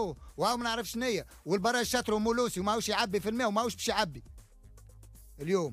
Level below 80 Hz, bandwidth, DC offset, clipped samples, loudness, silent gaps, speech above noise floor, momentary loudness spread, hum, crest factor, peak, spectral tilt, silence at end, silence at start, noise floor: -54 dBFS; 15.5 kHz; under 0.1%; under 0.1%; -31 LUFS; none; 23 dB; 6 LU; none; 16 dB; -16 dBFS; -3.5 dB/octave; 0 s; 0 s; -54 dBFS